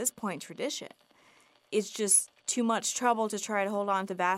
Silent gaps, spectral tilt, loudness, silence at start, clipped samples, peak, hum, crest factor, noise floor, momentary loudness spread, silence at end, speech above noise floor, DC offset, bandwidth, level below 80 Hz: none; -2.5 dB/octave; -29 LUFS; 0 s; under 0.1%; -12 dBFS; none; 20 dB; -63 dBFS; 12 LU; 0 s; 32 dB; under 0.1%; 16 kHz; -84 dBFS